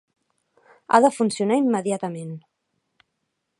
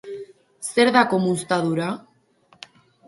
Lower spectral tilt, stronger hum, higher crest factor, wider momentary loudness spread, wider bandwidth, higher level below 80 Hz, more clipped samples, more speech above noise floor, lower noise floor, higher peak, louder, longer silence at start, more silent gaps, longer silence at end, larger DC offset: about the same, -5.5 dB/octave vs -5 dB/octave; neither; about the same, 22 dB vs 22 dB; about the same, 18 LU vs 19 LU; about the same, 11.5 kHz vs 11.5 kHz; second, -78 dBFS vs -68 dBFS; neither; first, 57 dB vs 39 dB; first, -77 dBFS vs -59 dBFS; about the same, -2 dBFS vs 0 dBFS; about the same, -21 LUFS vs -20 LUFS; first, 0.9 s vs 0.05 s; neither; about the same, 1.2 s vs 1.1 s; neither